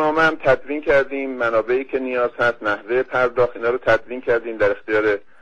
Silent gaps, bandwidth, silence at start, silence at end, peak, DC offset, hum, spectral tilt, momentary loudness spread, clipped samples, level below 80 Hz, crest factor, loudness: none; 9.2 kHz; 0 s; 0.2 s; -2 dBFS; under 0.1%; none; -6 dB/octave; 4 LU; under 0.1%; -48 dBFS; 18 dB; -20 LUFS